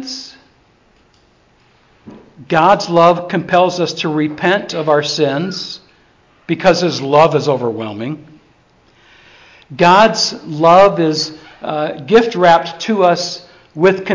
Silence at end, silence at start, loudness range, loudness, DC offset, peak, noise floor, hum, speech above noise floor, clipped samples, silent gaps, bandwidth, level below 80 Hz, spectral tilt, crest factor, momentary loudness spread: 0 s; 0 s; 4 LU; -13 LUFS; under 0.1%; 0 dBFS; -52 dBFS; none; 40 dB; under 0.1%; none; 7.6 kHz; -54 dBFS; -5 dB/octave; 14 dB; 16 LU